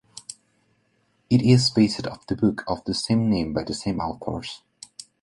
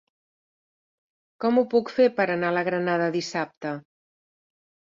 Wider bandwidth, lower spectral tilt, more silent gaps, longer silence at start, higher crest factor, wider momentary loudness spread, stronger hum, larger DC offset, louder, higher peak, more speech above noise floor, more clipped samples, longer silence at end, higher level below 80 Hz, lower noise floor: first, 11.5 kHz vs 7.6 kHz; about the same, -6 dB/octave vs -6 dB/octave; second, none vs 3.57-3.61 s; second, 0.15 s vs 1.4 s; about the same, 20 dB vs 18 dB; first, 22 LU vs 11 LU; neither; neither; about the same, -23 LUFS vs -24 LUFS; first, -4 dBFS vs -8 dBFS; second, 45 dB vs over 66 dB; neither; second, 0.65 s vs 1.15 s; first, -50 dBFS vs -72 dBFS; second, -67 dBFS vs under -90 dBFS